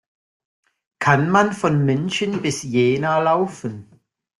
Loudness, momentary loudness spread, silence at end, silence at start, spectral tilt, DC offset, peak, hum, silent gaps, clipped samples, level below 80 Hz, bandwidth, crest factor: -19 LUFS; 9 LU; 0.55 s; 1 s; -5.5 dB/octave; under 0.1%; -2 dBFS; none; none; under 0.1%; -58 dBFS; 12 kHz; 18 dB